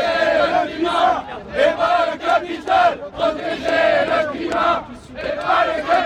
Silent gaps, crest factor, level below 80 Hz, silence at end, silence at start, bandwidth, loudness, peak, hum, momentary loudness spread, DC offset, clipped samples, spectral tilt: none; 14 dB; -48 dBFS; 0 s; 0 s; 10.5 kHz; -18 LUFS; -4 dBFS; none; 8 LU; under 0.1%; under 0.1%; -4.5 dB/octave